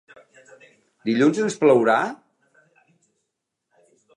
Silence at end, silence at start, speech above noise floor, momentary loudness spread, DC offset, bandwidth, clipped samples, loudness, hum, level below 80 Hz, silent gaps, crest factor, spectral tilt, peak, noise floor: 2 s; 1.05 s; 61 dB; 14 LU; under 0.1%; 10.5 kHz; under 0.1%; -20 LUFS; none; -76 dBFS; none; 20 dB; -5.5 dB/octave; -4 dBFS; -80 dBFS